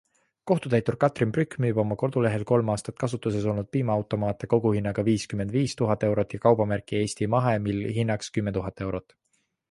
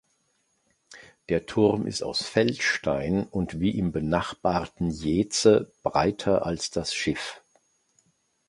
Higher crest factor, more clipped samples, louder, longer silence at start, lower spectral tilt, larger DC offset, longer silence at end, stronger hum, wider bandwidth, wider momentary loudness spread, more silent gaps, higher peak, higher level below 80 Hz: about the same, 20 dB vs 22 dB; neither; about the same, -26 LUFS vs -26 LUFS; second, 0.45 s vs 0.9 s; first, -7 dB/octave vs -5 dB/octave; neither; second, 0.7 s vs 1.1 s; neither; about the same, 11.5 kHz vs 11.5 kHz; about the same, 6 LU vs 8 LU; neither; about the same, -6 dBFS vs -6 dBFS; about the same, -52 dBFS vs -48 dBFS